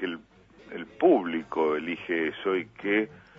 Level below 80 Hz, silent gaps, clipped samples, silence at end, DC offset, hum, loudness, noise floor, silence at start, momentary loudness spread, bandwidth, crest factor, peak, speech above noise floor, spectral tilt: -66 dBFS; none; under 0.1%; 0 s; under 0.1%; none; -27 LUFS; -54 dBFS; 0 s; 18 LU; 5.8 kHz; 18 dB; -10 dBFS; 27 dB; -7 dB/octave